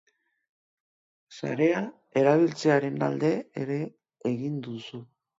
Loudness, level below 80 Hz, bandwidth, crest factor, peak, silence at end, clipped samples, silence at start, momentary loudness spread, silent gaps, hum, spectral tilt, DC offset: -27 LUFS; -74 dBFS; 7.8 kHz; 20 dB; -8 dBFS; 0.35 s; under 0.1%; 1.3 s; 15 LU; none; none; -7 dB/octave; under 0.1%